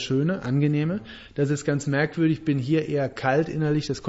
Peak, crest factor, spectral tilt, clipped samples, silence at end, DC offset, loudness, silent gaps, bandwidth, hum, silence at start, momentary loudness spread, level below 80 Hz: -8 dBFS; 16 dB; -7 dB/octave; under 0.1%; 0 s; under 0.1%; -24 LUFS; none; 8 kHz; none; 0 s; 5 LU; -54 dBFS